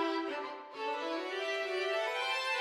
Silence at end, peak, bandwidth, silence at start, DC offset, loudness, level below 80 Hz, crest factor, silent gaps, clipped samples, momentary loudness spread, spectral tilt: 0 s; -20 dBFS; 15 kHz; 0 s; under 0.1%; -35 LUFS; -84 dBFS; 14 dB; none; under 0.1%; 7 LU; -1 dB/octave